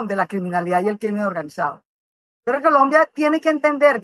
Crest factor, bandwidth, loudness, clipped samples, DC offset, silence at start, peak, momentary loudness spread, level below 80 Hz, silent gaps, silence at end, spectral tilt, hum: 16 dB; 12.5 kHz; -19 LUFS; under 0.1%; under 0.1%; 0 s; -2 dBFS; 10 LU; -72 dBFS; 1.85-2.43 s; 0.05 s; -6.5 dB/octave; none